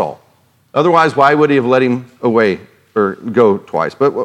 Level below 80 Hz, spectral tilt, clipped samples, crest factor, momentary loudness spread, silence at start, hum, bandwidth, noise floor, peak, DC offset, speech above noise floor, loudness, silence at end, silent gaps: -62 dBFS; -7 dB/octave; 0.1%; 14 dB; 9 LU; 0 s; none; 10.5 kHz; -54 dBFS; 0 dBFS; under 0.1%; 41 dB; -13 LUFS; 0 s; none